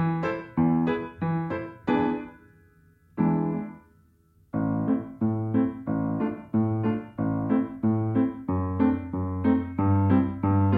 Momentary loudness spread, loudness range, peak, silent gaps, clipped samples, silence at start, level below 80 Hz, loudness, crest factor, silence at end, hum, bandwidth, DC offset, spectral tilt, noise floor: 7 LU; 5 LU; -10 dBFS; none; under 0.1%; 0 s; -54 dBFS; -27 LUFS; 16 dB; 0 s; none; 4.9 kHz; under 0.1%; -11 dB/octave; -61 dBFS